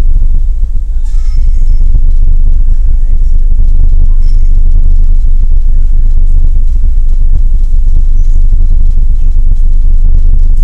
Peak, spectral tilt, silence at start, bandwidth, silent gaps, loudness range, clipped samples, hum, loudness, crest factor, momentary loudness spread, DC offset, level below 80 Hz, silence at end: 0 dBFS; -8.5 dB/octave; 0 s; 0.6 kHz; none; 1 LU; 10%; none; -13 LUFS; 2 dB; 2 LU; 2%; -4 dBFS; 0 s